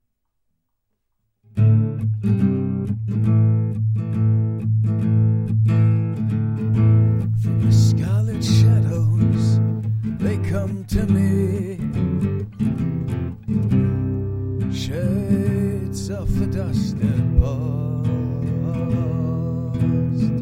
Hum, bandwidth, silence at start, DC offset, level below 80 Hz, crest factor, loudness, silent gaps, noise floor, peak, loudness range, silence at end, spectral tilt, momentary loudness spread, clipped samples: none; 9.8 kHz; 1.55 s; under 0.1%; -36 dBFS; 16 dB; -20 LUFS; none; -73 dBFS; -4 dBFS; 5 LU; 0 s; -8.5 dB/octave; 8 LU; under 0.1%